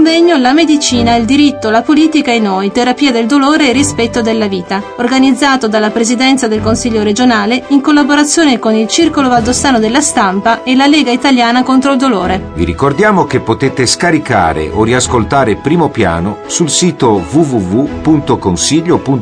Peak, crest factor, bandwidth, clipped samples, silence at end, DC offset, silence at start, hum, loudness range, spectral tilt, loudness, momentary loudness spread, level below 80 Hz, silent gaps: 0 dBFS; 10 dB; 10.5 kHz; under 0.1%; 0 s; under 0.1%; 0 s; none; 2 LU; -4 dB/octave; -10 LUFS; 5 LU; -34 dBFS; none